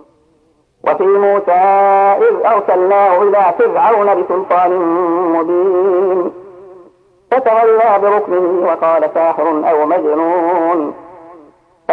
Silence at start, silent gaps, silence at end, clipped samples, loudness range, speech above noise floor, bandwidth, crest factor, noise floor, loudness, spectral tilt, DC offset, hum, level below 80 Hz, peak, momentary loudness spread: 0.85 s; none; 0 s; under 0.1%; 4 LU; 44 dB; 4.5 kHz; 12 dB; -55 dBFS; -12 LUFS; -8 dB/octave; under 0.1%; none; -64 dBFS; 0 dBFS; 5 LU